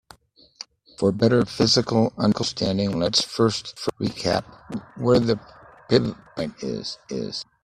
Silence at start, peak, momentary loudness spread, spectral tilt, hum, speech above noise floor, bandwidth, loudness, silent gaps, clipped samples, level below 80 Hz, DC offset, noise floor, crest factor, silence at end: 1 s; -2 dBFS; 14 LU; -5 dB/octave; none; 29 dB; 13 kHz; -23 LUFS; none; under 0.1%; -54 dBFS; under 0.1%; -52 dBFS; 22 dB; 0.2 s